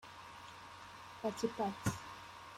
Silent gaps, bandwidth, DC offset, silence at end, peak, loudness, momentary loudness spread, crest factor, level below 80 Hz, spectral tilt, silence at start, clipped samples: none; 16 kHz; under 0.1%; 0 s; -22 dBFS; -43 LUFS; 14 LU; 22 dB; -66 dBFS; -5 dB/octave; 0 s; under 0.1%